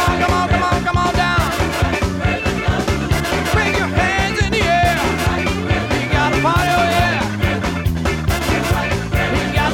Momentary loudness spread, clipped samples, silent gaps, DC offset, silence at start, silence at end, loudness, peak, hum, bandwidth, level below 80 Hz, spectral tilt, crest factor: 4 LU; under 0.1%; none; under 0.1%; 0 s; 0 s; -17 LUFS; -6 dBFS; none; 17.5 kHz; -26 dBFS; -5 dB/octave; 10 dB